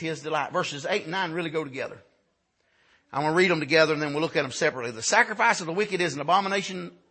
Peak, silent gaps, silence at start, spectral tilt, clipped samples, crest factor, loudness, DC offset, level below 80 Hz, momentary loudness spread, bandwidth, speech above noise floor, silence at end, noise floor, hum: -6 dBFS; none; 0 s; -3.5 dB/octave; under 0.1%; 20 dB; -25 LUFS; under 0.1%; -72 dBFS; 11 LU; 8.8 kHz; 46 dB; 0.2 s; -72 dBFS; none